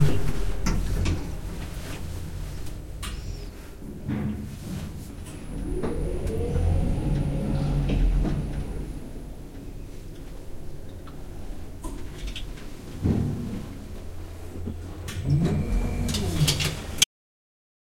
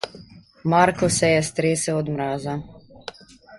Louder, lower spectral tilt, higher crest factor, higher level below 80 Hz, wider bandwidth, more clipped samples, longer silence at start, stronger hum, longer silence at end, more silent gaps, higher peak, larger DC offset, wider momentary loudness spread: second, -29 LUFS vs -21 LUFS; about the same, -5 dB/octave vs -4.5 dB/octave; first, 26 dB vs 20 dB; first, -32 dBFS vs -52 dBFS; first, 16.5 kHz vs 11.5 kHz; neither; about the same, 0 s vs 0.05 s; neither; first, 0.95 s vs 0 s; neither; about the same, 0 dBFS vs -2 dBFS; neither; second, 17 LU vs 21 LU